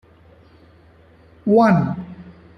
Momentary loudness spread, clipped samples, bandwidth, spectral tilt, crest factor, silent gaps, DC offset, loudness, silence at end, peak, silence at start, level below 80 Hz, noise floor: 23 LU; under 0.1%; 9.6 kHz; -9 dB/octave; 18 dB; none; under 0.1%; -17 LUFS; 0.3 s; -4 dBFS; 1.45 s; -54 dBFS; -50 dBFS